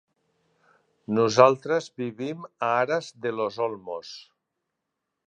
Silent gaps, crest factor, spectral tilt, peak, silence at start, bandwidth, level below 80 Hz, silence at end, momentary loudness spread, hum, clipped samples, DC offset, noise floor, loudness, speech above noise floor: none; 24 dB; -5 dB/octave; -2 dBFS; 1.1 s; 9.2 kHz; -72 dBFS; 1.1 s; 18 LU; none; under 0.1%; under 0.1%; -82 dBFS; -25 LUFS; 58 dB